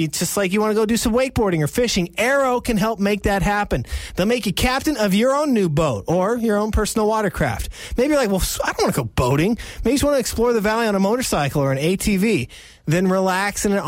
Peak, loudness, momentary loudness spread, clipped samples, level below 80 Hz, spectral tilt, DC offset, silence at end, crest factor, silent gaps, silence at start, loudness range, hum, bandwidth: -6 dBFS; -19 LUFS; 4 LU; under 0.1%; -34 dBFS; -5 dB/octave; under 0.1%; 0 s; 12 dB; none; 0 s; 1 LU; none; 16.5 kHz